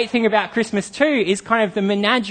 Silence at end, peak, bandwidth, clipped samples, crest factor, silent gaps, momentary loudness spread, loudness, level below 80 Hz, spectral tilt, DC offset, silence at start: 0 s; -2 dBFS; 9.8 kHz; under 0.1%; 18 dB; none; 4 LU; -19 LUFS; -58 dBFS; -4.5 dB/octave; under 0.1%; 0 s